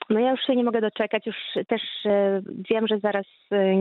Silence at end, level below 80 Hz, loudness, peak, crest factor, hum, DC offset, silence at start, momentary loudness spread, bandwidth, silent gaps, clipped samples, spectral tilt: 0 s; -74 dBFS; -24 LUFS; -8 dBFS; 16 dB; none; under 0.1%; 0 s; 7 LU; 4.4 kHz; none; under 0.1%; -9 dB/octave